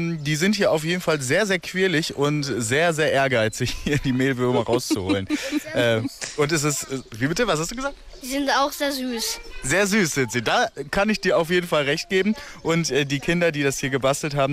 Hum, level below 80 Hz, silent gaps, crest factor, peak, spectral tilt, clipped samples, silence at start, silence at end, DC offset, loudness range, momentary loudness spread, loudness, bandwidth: none; -46 dBFS; none; 12 dB; -10 dBFS; -4 dB/octave; under 0.1%; 0 s; 0 s; under 0.1%; 2 LU; 6 LU; -22 LUFS; 16 kHz